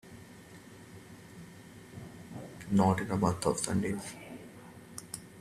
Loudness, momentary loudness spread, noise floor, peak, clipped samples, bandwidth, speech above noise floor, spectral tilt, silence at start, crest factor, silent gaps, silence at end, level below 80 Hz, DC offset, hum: -32 LUFS; 23 LU; -52 dBFS; -12 dBFS; under 0.1%; 14.5 kHz; 22 dB; -5.5 dB/octave; 0.05 s; 24 dB; none; 0 s; -62 dBFS; under 0.1%; none